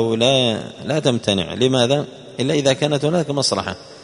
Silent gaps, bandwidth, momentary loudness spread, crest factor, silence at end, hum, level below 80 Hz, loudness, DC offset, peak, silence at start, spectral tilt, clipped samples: none; 11 kHz; 9 LU; 18 dB; 0 s; none; -54 dBFS; -18 LUFS; under 0.1%; 0 dBFS; 0 s; -4.5 dB/octave; under 0.1%